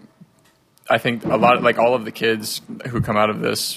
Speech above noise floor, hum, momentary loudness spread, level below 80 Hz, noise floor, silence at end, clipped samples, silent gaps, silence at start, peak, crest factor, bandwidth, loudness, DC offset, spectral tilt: 38 dB; none; 10 LU; -50 dBFS; -57 dBFS; 0 s; under 0.1%; none; 0.85 s; -2 dBFS; 18 dB; 15.5 kHz; -19 LUFS; under 0.1%; -4.5 dB/octave